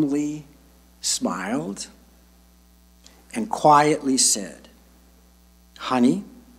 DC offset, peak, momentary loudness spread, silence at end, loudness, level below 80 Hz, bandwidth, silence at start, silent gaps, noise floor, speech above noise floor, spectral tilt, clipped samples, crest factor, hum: under 0.1%; -2 dBFS; 18 LU; 0.3 s; -21 LUFS; -56 dBFS; 16 kHz; 0 s; none; -54 dBFS; 33 dB; -3 dB/octave; under 0.1%; 22 dB; none